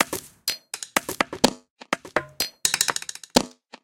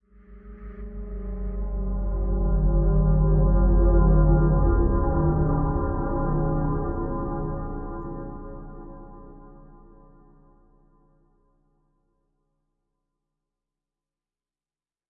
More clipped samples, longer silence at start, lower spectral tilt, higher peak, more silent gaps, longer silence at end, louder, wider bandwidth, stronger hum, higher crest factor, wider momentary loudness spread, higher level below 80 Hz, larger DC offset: neither; second, 0 s vs 0.3 s; second, -1.5 dB/octave vs -15.5 dB/octave; first, 0 dBFS vs -8 dBFS; first, 1.70-1.76 s vs none; second, 0.35 s vs 5.5 s; about the same, -25 LUFS vs -24 LUFS; first, 17 kHz vs 1.9 kHz; neither; first, 26 dB vs 16 dB; second, 9 LU vs 21 LU; second, -54 dBFS vs -26 dBFS; neither